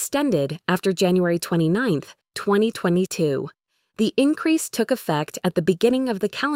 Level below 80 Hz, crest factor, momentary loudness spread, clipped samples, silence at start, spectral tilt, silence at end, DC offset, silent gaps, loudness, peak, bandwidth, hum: -60 dBFS; 16 dB; 6 LU; under 0.1%; 0 s; -5.5 dB/octave; 0 s; under 0.1%; none; -22 LUFS; -6 dBFS; 16.5 kHz; none